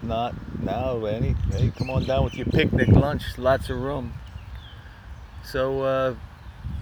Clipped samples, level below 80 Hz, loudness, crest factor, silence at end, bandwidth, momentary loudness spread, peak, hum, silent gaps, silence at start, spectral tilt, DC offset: under 0.1%; -34 dBFS; -24 LUFS; 22 dB; 0 s; 19.5 kHz; 22 LU; -4 dBFS; none; none; 0 s; -7.5 dB/octave; under 0.1%